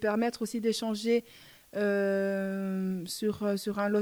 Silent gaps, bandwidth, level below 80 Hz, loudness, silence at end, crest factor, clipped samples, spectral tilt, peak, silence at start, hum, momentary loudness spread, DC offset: none; over 20 kHz; -70 dBFS; -31 LUFS; 0 s; 14 dB; under 0.1%; -5.5 dB/octave; -16 dBFS; 0 s; none; 4 LU; under 0.1%